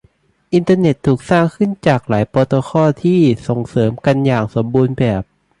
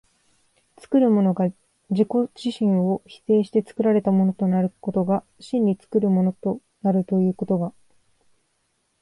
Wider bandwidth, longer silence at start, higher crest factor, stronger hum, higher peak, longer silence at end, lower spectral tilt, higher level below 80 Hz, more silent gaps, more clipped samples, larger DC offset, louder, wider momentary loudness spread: about the same, 11 kHz vs 10.5 kHz; second, 0.5 s vs 0.9 s; about the same, 14 dB vs 16 dB; neither; first, 0 dBFS vs -8 dBFS; second, 0.35 s vs 1.3 s; second, -8 dB/octave vs -9.5 dB/octave; first, -44 dBFS vs -66 dBFS; neither; neither; neither; first, -15 LUFS vs -22 LUFS; second, 5 LU vs 8 LU